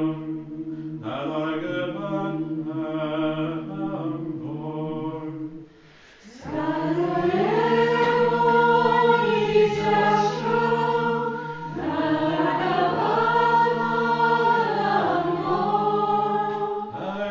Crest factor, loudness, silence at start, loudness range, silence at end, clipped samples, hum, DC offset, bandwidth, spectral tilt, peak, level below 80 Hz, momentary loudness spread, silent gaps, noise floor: 16 dB; -23 LUFS; 0 s; 9 LU; 0 s; under 0.1%; none; under 0.1%; 7.6 kHz; -7 dB/octave; -8 dBFS; -60 dBFS; 12 LU; none; -50 dBFS